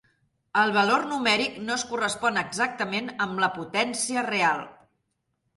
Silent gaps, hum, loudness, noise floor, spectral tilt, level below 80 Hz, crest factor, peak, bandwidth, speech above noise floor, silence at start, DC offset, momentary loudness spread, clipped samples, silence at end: none; none; -25 LUFS; -77 dBFS; -2.5 dB/octave; -68 dBFS; 18 dB; -8 dBFS; 11.5 kHz; 51 dB; 0.55 s; under 0.1%; 7 LU; under 0.1%; 0.85 s